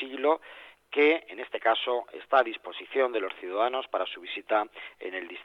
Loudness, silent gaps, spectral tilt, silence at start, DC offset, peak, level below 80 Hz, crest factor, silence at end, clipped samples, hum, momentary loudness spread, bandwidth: -29 LUFS; none; -4 dB/octave; 0 s; under 0.1%; -10 dBFS; -78 dBFS; 20 dB; 0 s; under 0.1%; none; 13 LU; 5.6 kHz